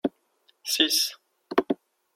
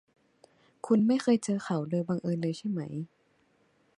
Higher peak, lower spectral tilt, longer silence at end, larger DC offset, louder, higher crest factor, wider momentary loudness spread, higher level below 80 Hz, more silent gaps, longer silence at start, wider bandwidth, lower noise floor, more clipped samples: first, -4 dBFS vs -14 dBFS; second, -1 dB/octave vs -7 dB/octave; second, 0.4 s vs 0.9 s; neither; first, -25 LUFS vs -30 LUFS; first, 24 dB vs 18 dB; second, 12 LU vs 15 LU; about the same, -70 dBFS vs -74 dBFS; neither; second, 0.05 s vs 0.85 s; first, 16.5 kHz vs 11 kHz; about the same, -67 dBFS vs -69 dBFS; neither